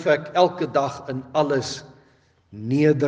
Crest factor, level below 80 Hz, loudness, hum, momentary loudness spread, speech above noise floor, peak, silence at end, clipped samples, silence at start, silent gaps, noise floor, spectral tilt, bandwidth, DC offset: 18 dB; -66 dBFS; -22 LUFS; none; 13 LU; 38 dB; -4 dBFS; 0 s; under 0.1%; 0 s; none; -59 dBFS; -6 dB/octave; 9.4 kHz; under 0.1%